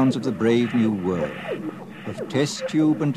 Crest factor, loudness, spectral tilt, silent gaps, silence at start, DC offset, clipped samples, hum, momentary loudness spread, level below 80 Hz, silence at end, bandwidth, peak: 14 dB; -23 LUFS; -6.5 dB/octave; none; 0 s; 0.1%; under 0.1%; none; 13 LU; -58 dBFS; 0 s; 13 kHz; -8 dBFS